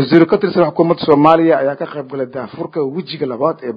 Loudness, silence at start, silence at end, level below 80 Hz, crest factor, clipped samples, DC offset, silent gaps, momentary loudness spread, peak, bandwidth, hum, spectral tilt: -15 LUFS; 0 s; 0 s; -58 dBFS; 14 dB; 0.2%; under 0.1%; none; 14 LU; 0 dBFS; 5.2 kHz; none; -9 dB/octave